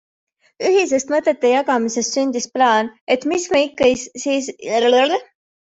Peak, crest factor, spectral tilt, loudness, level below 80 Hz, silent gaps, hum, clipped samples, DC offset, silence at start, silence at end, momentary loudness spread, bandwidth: -2 dBFS; 16 dB; -2.5 dB/octave; -18 LUFS; -58 dBFS; 3.01-3.07 s; none; under 0.1%; under 0.1%; 0.6 s; 0.5 s; 6 LU; 8 kHz